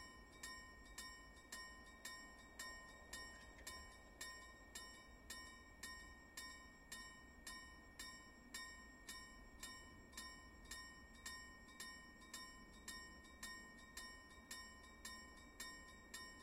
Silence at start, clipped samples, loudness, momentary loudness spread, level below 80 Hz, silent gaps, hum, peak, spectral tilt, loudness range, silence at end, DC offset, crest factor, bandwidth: 0 s; under 0.1%; -56 LUFS; 5 LU; -68 dBFS; none; none; -38 dBFS; -1.5 dB/octave; 1 LU; 0 s; under 0.1%; 20 dB; 16.5 kHz